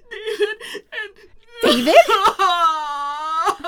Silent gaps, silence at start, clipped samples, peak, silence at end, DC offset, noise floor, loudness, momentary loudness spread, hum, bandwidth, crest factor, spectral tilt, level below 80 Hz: none; 0.1 s; under 0.1%; 0 dBFS; 0 s; under 0.1%; -45 dBFS; -17 LUFS; 18 LU; none; 19 kHz; 18 dB; -2 dB/octave; -52 dBFS